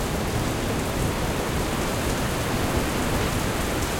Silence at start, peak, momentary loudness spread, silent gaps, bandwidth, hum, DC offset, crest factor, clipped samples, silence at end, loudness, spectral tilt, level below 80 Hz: 0 s; -10 dBFS; 1 LU; none; 17 kHz; none; under 0.1%; 14 dB; under 0.1%; 0 s; -25 LUFS; -4.5 dB/octave; -32 dBFS